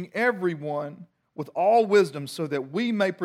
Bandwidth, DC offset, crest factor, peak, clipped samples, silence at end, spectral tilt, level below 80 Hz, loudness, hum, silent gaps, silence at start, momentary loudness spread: 14.5 kHz; under 0.1%; 16 dB; -10 dBFS; under 0.1%; 0 s; -6 dB/octave; -80 dBFS; -25 LUFS; none; none; 0 s; 15 LU